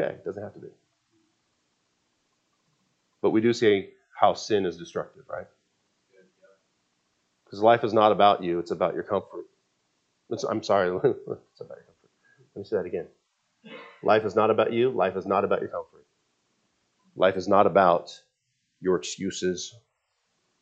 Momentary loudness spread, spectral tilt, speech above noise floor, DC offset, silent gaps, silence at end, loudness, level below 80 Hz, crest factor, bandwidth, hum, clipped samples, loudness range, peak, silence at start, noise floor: 22 LU; -5.5 dB/octave; 51 dB; under 0.1%; none; 0.9 s; -25 LUFS; -72 dBFS; 22 dB; 8.4 kHz; none; under 0.1%; 6 LU; -4 dBFS; 0 s; -76 dBFS